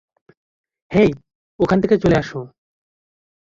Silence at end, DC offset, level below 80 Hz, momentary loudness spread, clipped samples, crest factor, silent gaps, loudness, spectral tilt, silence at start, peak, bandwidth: 0.95 s; under 0.1%; -44 dBFS; 18 LU; under 0.1%; 18 dB; 1.35-1.59 s; -17 LUFS; -8 dB/octave; 0.9 s; -2 dBFS; 7.6 kHz